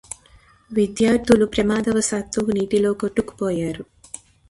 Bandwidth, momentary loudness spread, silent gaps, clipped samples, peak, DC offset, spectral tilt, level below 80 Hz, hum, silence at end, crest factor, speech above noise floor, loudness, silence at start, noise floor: 11.5 kHz; 20 LU; none; under 0.1%; -2 dBFS; under 0.1%; -5 dB/octave; -46 dBFS; none; 0.35 s; 20 dB; 33 dB; -20 LUFS; 0.7 s; -52 dBFS